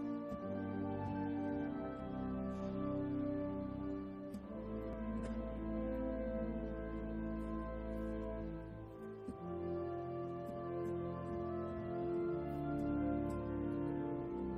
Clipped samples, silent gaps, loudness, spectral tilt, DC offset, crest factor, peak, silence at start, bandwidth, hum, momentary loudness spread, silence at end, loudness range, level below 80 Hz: under 0.1%; none; -42 LUFS; -9.5 dB/octave; under 0.1%; 14 dB; -28 dBFS; 0 s; 10 kHz; none; 6 LU; 0 s; 4 LU; -52 dBFS